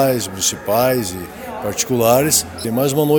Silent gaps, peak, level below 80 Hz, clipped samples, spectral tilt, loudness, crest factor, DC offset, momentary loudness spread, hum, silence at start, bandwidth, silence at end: none; 0 dBFS; -48 dBFS; under 0.1%; -4 dB/octave; -17 LUFS; 16 dB; under 0.1%; 12 LU; none; 0 s; over 20 kHz; 0 s